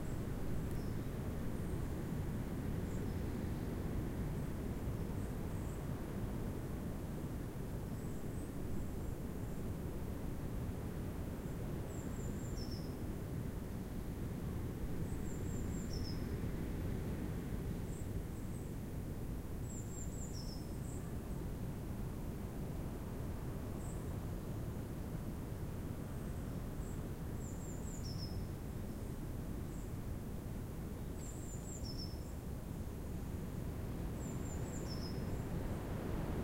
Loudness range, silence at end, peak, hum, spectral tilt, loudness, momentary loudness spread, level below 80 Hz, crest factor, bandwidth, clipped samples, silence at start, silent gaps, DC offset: 3 LU; 0 s; -28 dBFS; none; -6.5 dB/octave; -44 LUFS; 3 LU; -48 dBFS; 14 dB; 16 kHz; under 0.1%; 0 s; none; under 0.1%